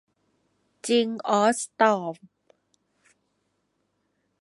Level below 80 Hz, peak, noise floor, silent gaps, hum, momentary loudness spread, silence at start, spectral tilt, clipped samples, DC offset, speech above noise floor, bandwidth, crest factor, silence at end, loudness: -78 dBFS; -6 dBFS; -74 dBFS; none; none; 15 LU; 0.85 s; -3.5 dB/octave; under 0.1%; under 0.1%; 51 dB; 11.5 kHz; 22 dB; 2.25 s; -23 LUFS